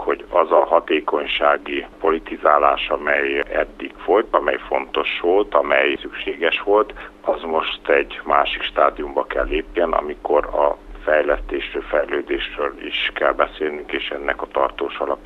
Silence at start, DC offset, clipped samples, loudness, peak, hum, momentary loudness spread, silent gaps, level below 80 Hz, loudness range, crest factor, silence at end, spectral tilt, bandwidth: 0 s; under 0.1%; under 0.1%; -20 LUFS; 0 dBFS; none; 8 LU; none; -42 dBFS; 3 LU; 20 dB; 0 s; -5.5 dB/octave; 6.2 kHz